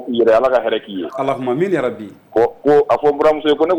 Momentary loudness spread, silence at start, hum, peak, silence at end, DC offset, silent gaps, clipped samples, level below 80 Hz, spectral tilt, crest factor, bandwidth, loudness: 9 LU; 0 s; none; -6 dBFS; 0 s; under 0.1%; none; under 0.1%; -52 dBFS; -6.5 dB/octave; 10 dB; 19 kHz; -16 LUFS